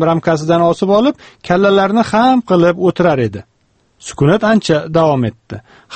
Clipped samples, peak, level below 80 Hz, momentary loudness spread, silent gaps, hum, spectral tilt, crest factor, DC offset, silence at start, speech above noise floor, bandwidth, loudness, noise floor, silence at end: under 0.1%; 0 dBFS; -46 dBFS; 19 LU; none; none; -6.5 dB/octave; 14 dB; under 0.1%; 0 s; 45 dB; 8.8 kHz; -13 LUFS; -57 dBFS; 0 s